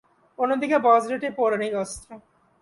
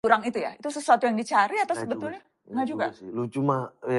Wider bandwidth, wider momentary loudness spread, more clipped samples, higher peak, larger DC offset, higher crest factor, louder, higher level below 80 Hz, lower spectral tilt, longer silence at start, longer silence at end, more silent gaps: about the same, 11.5 kHz vs 11.5 kHz; about the same, 12 LU vs 11 LU; neither; about the same, -6 dBFS vs -4 dBFS; neither; about the same, 18 dB vs 22 dB; first, -23 LUFS vs -26 LUFS; first, -60 dBFS vs -70 dBFS; about the same, -4.5 dB/octave vs -5.5 dB/octave; first, 0.4 s vs 0.05 s; first, 0.4 s vs 0 s; neither